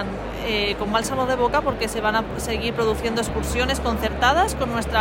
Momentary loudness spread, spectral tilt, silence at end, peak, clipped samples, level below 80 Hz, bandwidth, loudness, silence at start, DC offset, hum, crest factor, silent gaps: 5 LU; -4 dB/octave; 0 s; -6 dBFS; under 0.1%; -34 dBFS; 16.5 kHz; -22 LUFS; 0 s; under 0.1%; none; 16 dB; none